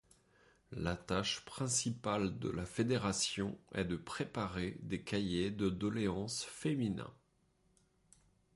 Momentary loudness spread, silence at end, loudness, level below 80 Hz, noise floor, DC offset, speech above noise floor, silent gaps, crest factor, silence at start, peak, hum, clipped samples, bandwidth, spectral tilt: 6 LU; 1.4 s; -38 LUFS; -60 dBFS; -75 dBFS; under 0.1%; 37 dB; none; 18 dB; 0.7 s; -22 dBFS; none; under 0.1%; 11.5 kHz; -4.5 dB/octave